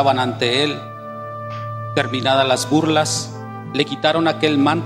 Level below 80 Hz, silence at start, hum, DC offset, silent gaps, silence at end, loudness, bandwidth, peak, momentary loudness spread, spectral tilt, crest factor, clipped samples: -60 dBFS; 0 s; none; under 0.1%; none; 0 s; -18 LUFS; 15.5 kHz; -2 dBFS; 13 LU; -4.5 dB/octave; 18 dB; under 0.1%